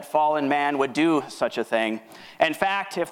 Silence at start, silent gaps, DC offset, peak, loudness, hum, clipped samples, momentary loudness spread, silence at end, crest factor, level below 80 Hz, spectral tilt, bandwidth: 0 s; none; under 0.1%; -4 dBFS; -24 LUFS; none; under 0.1%; 6 LU; 0 s; 20 dB; -68 dBFS; -4.5 dB/octave; 16.5 kHz